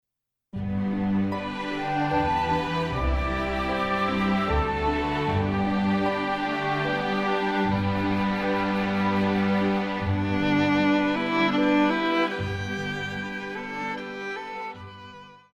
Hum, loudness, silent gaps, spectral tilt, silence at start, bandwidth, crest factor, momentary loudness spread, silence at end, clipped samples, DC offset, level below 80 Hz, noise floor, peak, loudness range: none; -25 LUFS; none; -7 dB/octave; 0.55 s; 9.4 kHz; 14 dB; 10 LU; 0.2 s; under 0.1%; under 0.1%; -40 dBFS; -79 dBFS; -10 dBFS; 3 LU